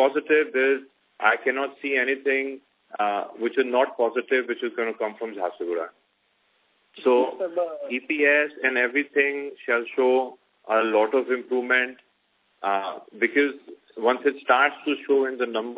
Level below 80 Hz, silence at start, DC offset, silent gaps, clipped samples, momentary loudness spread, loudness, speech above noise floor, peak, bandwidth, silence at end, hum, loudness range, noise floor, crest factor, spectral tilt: -82 dBFS; 0 s; under 0.1%; none; under 0.1%; 10 LU; -24 LUFS; 45 dB; -4 dBFS; 4 kHz; 0 s; none; 5 LU; -68 dBFS; 20 dB; -6.5 dB/octave